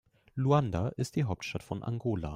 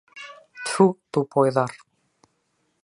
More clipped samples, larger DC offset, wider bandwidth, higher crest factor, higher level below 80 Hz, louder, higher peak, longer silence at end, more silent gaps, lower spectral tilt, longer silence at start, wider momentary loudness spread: neither; neither; first, 13.5 kHz vs 11.5 kHz; about the same, 18 dB vs 22 dB; first, -54 dBFS vs -72 dBFS; second, -32 LUFS vs -22 LUFS; second, -14 dBFS vs -2 dBFS; second, 0 s vs 1.05 s; neither; about the same, -7 dB/octave vs -6 dB/octave; first, 0.35 s vs 0.15 s; second, 10 LU vs 21 LU